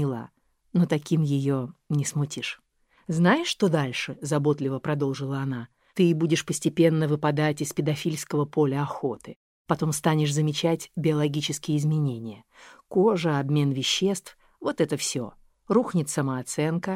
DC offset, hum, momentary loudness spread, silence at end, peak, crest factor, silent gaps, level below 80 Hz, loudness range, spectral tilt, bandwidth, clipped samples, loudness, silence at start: under 0.1%; none; 10 LU; 0 s; -8 dBFS; 18 dB; 9.36-9.65 s; -64 dBFS; 2 LU; -5.5 dB/octave; 15.5 kHz; under 0.1%; -26 LUFS; 0 s